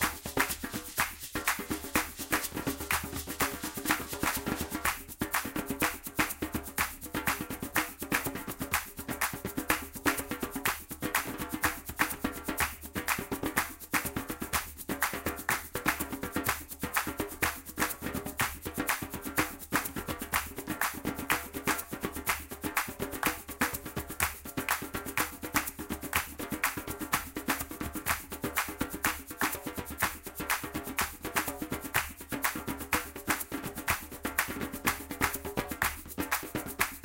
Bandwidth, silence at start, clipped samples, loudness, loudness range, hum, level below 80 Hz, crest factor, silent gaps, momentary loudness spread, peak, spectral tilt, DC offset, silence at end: 17 kHz; 0 s; under 0.1%; -33 LUFS; 1 LU; none; -50 dBFS; 26 dB; none; 5 LU; -8 dBFS; -2.5 dB/octave; under 0.1%; 0 s